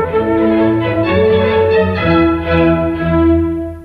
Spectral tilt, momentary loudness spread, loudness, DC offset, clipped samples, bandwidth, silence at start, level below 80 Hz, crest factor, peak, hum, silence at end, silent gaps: -9 dB/octave; 3 LU; -13 LUFS; under 0.1%; under 0.1%; 4.9 kHz; 0 s; -30 dBFS; 12 dB; 0 dBFS; none; 0 s; none